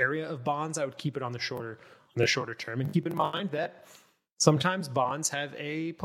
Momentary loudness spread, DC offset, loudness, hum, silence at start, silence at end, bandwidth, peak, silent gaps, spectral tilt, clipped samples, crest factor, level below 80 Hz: 9 LU; under 0.1%; -30 LUFS; none; 0 s; 0 s; 16.5 kHz; -4 dBFS; 4.32-4.37 s; -4 dB/octave; under 0.1%; 26 dB; -74 dBFS